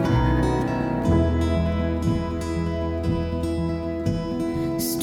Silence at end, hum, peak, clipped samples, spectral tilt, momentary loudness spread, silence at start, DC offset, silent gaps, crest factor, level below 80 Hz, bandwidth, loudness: 0 s; none; -10 dBFS; under 0.1%; -7 dB/octave; 6 LU; 0 s; under 0.1%; none; 14 dB; -32 dBFS; 18 kHz; -24 LUFS